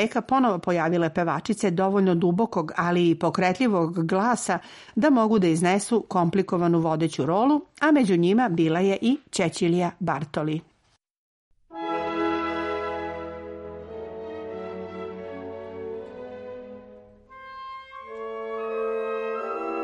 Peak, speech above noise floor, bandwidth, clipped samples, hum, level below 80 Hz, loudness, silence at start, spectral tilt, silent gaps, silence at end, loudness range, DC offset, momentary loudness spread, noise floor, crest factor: -10 dBFS; 44 dB; 11.5 kHz; under 0.1%; none; -60 dBFS; -24 LUFS; 0 s; -6 dB/octave; 11.17-11.51 s; 0 s; 15 LU; under 0.1%; 17 LU; -67 dBFS; 16 dB